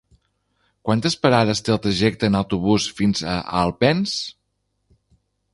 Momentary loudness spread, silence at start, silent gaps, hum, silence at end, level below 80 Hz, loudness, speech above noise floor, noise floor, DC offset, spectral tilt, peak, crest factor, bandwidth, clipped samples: 7 LU; 0.85 s; none; 50 Hz at -45 dBFS; 1.2 s; -46 dBFS; -20 LUFS; 53 dB; -72 dBFS; under 0.1%; -5.5 dB/octave; -2 dBFS; 20 dB; 11.5 kHz; under 0.1%